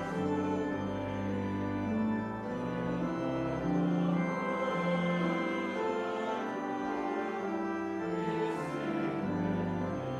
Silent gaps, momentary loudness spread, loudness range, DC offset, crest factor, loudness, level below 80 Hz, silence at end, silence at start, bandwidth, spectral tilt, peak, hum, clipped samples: none; 4 LU; 2 LU; under 0.1%; 14 dB; -34 LUFS; -60 dBFS; 0 s; 0 s; 9.6 kHz; -7.5 dB/octave; -20 dBFS; none; under 0.1%